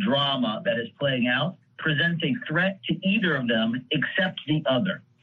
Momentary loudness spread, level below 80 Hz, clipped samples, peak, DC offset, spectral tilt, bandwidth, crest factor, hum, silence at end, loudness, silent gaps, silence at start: 4 LU; -66 dBFS; under 0.1%; -12 dBFS; under 0.1%; -8 dB/octave; 4.9 kHz; 14 dB; none; 0.25 s; -25 LUFS; none; 0 s